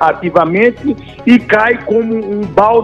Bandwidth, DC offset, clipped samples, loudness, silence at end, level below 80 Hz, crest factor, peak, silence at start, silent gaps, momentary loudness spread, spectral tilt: 7.2 kHz; 0.2%; 0.3%; -12 LUFS; 0 s; -42 dBFS; 12 dB; 0 dBFS; 0 s; none; 8 LU; -7.5 dB/octave